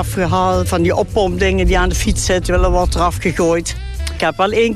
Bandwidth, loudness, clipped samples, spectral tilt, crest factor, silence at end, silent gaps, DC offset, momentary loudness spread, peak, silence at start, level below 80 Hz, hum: 14 kHz; -16 LUFS; under 0.1%; -5 dB/octave; 12 dB; 0 s; none; under 0.1%; 4 LU; -4 dBFS; 0 s; -22 dBFS; none